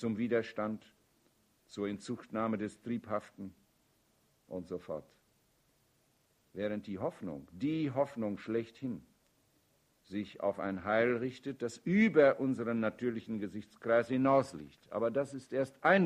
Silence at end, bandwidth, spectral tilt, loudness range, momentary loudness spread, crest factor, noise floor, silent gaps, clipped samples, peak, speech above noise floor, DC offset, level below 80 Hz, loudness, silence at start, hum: 0 s; 11.5 kHz; -7 dB/octave; 13 LU; 16 LU; 22 dB; -73 dBFS; none; under 0.1%; -14 dBFS; 39 dB; under 0.1%; -72 dBFS; -35 LUFS; 0 s; none